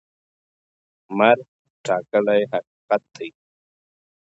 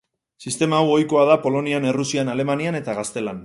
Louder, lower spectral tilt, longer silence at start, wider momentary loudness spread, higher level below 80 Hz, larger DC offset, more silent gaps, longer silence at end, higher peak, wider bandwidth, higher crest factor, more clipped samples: about the same, -21 LUFS vs -20 LUFS; about the same, -5.5 dB/octave vs -5 dB/octave; first, 1.1 s vs 0.4 s; first, 18 LU vs 10 LU; second, -72 dBFS vs -62 dBFS; neither; first, 1.48-1.84 s, 2.67-2.88 s vs none; first, 0.95 s vs 0 s; about the same, -2 dBFS vs 0 dBFS; second, 8 kHz vs 11.5 kHz; about the same, 22 dB vs 20 dB; neither